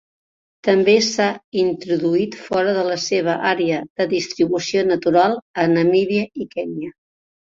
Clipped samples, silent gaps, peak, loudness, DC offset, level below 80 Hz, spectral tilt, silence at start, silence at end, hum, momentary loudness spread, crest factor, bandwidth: under 0.1%; 1.44-1.52 s, 3.90-3.96 s, 5.42-5.54 s; -2 dBFS; -19 LUFS; under 0.1%; -60 dBFS; -5 dB/octave; 0.65 s; 0.65 s; none; 10 LU; 18 dB; 7.8 kHz